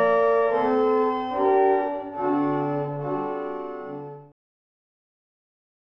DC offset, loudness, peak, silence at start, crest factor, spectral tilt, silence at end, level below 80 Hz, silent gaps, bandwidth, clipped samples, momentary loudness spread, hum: under 0.1%; -24 LUFS; -10 dBFS; 0 s; 16 dB; -9 dB/octave; 1.7 s; -66 dBFS; none; 6 kHz; under 0.1%; 14 LU; none